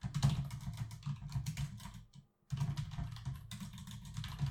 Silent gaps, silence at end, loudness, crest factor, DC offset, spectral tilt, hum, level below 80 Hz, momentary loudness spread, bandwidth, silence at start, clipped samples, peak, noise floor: none; 0 s; -42 LUFS; 22 dB; under 0.1%; -5.5 dB/octave; none; -52 dBFS; 14 LU; 16 kHz; 0 s; under 0.1%; -18 dBFS; -61 dBFS